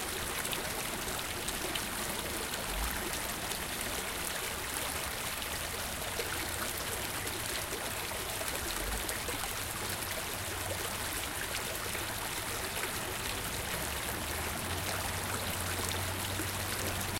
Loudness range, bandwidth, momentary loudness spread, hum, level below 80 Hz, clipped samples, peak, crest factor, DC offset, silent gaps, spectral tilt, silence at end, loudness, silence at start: 1 LU; 17 kHz; 1 LU; none; -48 dBFS; under 0.1%; -14 dBFS; 22 dB; under 0.1%; none; -2 dB/octave; 0 s; -35 LUFS; 0 s